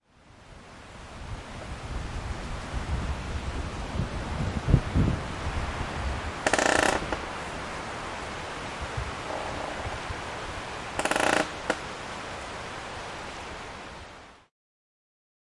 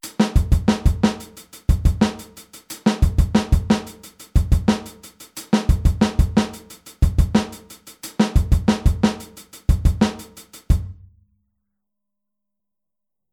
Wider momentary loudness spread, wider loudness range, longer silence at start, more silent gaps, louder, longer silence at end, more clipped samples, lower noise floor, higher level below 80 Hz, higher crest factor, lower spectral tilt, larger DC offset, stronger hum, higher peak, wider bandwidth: second, 16 LU vs 21 LU; first, 9 LU vs 5 LU; first, 0.25 s vs 0.05 s; neither; second, -31 LUFS vs -20 LUFS; second, 1.1 s vs 2.4 s; neither; second, -54 dBFS vs -87 dBFS; second, -40 dBFS vs -24 dBFS; first, 26 dB vs 18 dB; second, -4.5 dB/octave vs -6.5 dB/octave; neither; neither; about the same, -4 dBFS vs -2 dBFS; second, 11.5 kHz vs 18 kHz